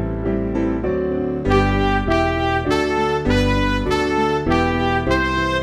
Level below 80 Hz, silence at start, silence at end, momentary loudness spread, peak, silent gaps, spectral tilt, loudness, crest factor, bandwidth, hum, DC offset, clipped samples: -28 dBFS; 0 s; 0 s; 4 LU; -4 dBFS; none; -6.5 dB/octave; -19 LUFS; 14 dB; 13.5 kHz; none; under 0.1%; under 0.1%